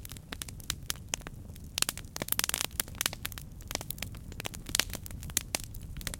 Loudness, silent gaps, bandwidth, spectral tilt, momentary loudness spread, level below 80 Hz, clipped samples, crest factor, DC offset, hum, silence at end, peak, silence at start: -34 LUFS; none; 17 kHz; -1.5 dB/octave; 11 LU; -48 dBFS; under 0.1%; 34 dB; under 0.1%; none; 0 s; -4 dBFS; 0 s